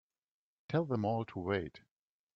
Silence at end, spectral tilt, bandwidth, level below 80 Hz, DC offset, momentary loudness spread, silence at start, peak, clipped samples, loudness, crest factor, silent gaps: 0.6 s; -9 dB/octave; 6.6 kHz; -70 dBFS; under 0.1%; 4 LU; 0.7 s; -20 dBFS; under 0.1%; -36 LUFS; 18 dB; none